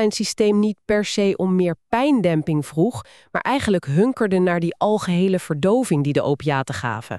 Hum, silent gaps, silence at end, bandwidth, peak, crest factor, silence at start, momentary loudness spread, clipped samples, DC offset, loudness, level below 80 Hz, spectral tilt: none; none; 0 s; 13 kHz; -6 dBFS; 14 dB; 0 s; 5 LU; under 0.1%; 0.1%; -20 LUFS; -54 dBFS; -6 dB/octave